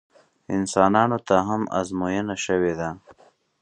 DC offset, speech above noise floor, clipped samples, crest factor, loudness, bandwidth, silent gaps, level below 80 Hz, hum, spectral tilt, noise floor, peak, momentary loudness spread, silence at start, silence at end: under 0.1%; 34 dB; under 0.1%; 22 dB; -23 LUFS; 11 kHz; none; -54 dBFS; none; -5.5 dB/octave; -56 dBFS; -2 dBFS; 11 LU; 0.5 s; 0.5 s